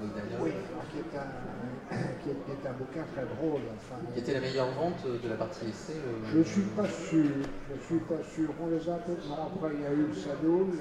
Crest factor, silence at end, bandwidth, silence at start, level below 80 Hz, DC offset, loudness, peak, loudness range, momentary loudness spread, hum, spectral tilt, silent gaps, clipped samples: 18 dB; 0 s; 10 kHz; 0 s; -56 dBFS; under 0.1%; -33 LUFS; -14 dBFS; 6 LU; 11 LU; none; -7 dB/octave; none; under 0.1%